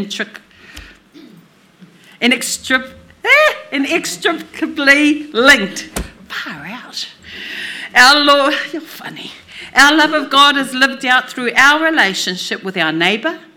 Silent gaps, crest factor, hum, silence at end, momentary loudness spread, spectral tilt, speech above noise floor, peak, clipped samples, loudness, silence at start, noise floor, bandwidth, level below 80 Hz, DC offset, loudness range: none; 16 dB; none; 0.2 s; 18 LU; -2 dB/octave; 32 dB; 0 dBFS; 0.2%; -12 LUFS; 0 s; -46 dBFS; over 20 kHz; -46 dBFS; under 0.1%; 4 LU